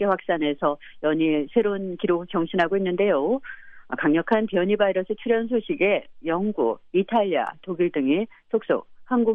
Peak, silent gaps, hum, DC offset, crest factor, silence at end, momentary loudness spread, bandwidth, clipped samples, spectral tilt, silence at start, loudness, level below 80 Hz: -8 dBFS; none; none; under 0.1%; 16 dB; 0 s; 6 LU; 5.4 kHz; under 0.1%; -8.5 dB/octave; 0 s; -24 LUFS; -60 dBFS